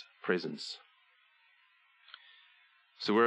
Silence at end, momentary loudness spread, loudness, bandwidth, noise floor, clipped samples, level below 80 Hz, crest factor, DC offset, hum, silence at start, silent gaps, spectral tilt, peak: 0 s; 23 LU; -36 LUFS; 10.5 kHz; -68 dBFS; under 0.1%; -88 dBFS; 24 dB; under 0.1%; none; 0 s; none; -5 dB/octave; -14 dBFS